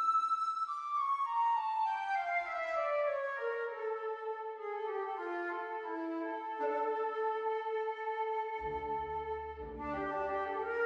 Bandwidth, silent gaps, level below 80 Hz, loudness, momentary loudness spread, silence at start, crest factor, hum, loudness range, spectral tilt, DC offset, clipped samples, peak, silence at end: 9.8 kHz; none; -62 dBFS; -36 LUFS; 7 LU; 0 s; 12 dB; none; 4 LU; -5.5 dB/octave; under 0.1%; under 0.1%; -24 dBFS; 0 s